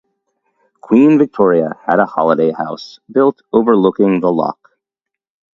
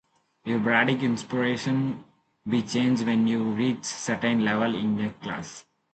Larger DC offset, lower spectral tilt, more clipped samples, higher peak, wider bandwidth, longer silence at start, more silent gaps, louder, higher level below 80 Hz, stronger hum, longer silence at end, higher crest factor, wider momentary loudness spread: neither; first, -8.5 dB/octave vs -5 dB/octave; neither; first, 0 dBFS vs -8 dBFS; second, 7 kHz vs 9 kHz; first, 0.85 s vs 0.45 s; neither; first, -14 LUFS vs -26 LUFS; first, -58 dBFS vs -64 dBFS; neither; first, 1.05 s vs 0.35 s; about the same, 14 dB vs 18 dB; second, 9 LU vs 13 LU